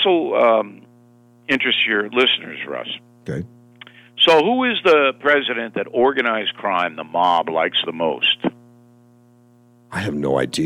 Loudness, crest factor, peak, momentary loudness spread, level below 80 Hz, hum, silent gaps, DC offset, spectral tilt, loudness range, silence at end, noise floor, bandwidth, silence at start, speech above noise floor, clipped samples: -18 LUFS; 16 dB; -2 dBFS; 15 LU; -60 dBFS; 60 Hz at -50 dBFS; none; under 0.1%; -4.5 dB/octave; 4 LU; 0 s; -52 dBFS; 14.5 kHz; 0 s; 34 dB; under 0.1%